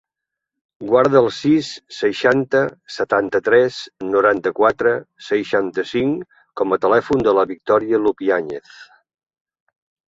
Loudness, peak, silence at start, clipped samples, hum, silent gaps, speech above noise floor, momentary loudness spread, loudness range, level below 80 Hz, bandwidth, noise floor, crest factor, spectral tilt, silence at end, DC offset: -18 LUFS; -2 dBFS; 0.8 s; under 0.1%; none; none; 66 dB; 10 LU; 2 LU; -56 dBFS; 7.8 kHz; -83 dBFS; 16 dB; -6 dB/octave; 1.25 s; under 0.1%